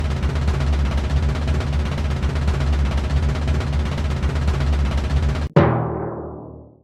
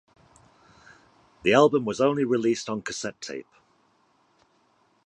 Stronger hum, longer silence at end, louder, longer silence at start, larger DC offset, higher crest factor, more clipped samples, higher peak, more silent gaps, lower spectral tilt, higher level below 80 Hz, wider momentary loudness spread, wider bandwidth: neither; second, 0.2 s vs 1.65 s; first, -21 LUFS vs -24 LUFS; second, 0 s vs 1.45 s; neither; about the same, 18 dB vs 22 dB; neither; first, -2 dBFS vs -6 dBFS; neither; first, -7 dB/octave vs -5 dB/octave; first, -22 dBFS vs -66 dBFS; second, 6 LU vs 17 LU; second, 9.4 kHz vs 10.5 kHz